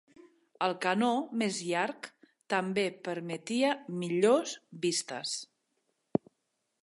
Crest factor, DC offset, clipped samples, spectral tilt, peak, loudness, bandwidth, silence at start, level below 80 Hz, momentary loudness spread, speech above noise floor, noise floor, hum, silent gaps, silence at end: 22 dB; under 0.1%; under 0.1%; -4 dB/octave; -10 dBFS; -32 LUFS; 11.5 kHz; 0.2 s; -80 dBFS; 10 LU; 50 dB; -81 dBFS; none; none; 1.4 s